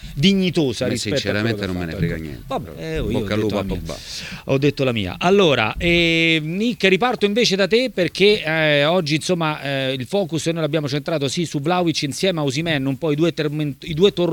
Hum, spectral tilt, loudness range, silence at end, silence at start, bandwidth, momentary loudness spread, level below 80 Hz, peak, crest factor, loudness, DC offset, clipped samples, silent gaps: none; -5 dB/octave; 6 LU; 0 s; 0 s; 19 kHz; 10 LU; -42 dBFS; 0 dBFS; 20 dB; -19 LUFS; under 0.1%; under 0.1%; none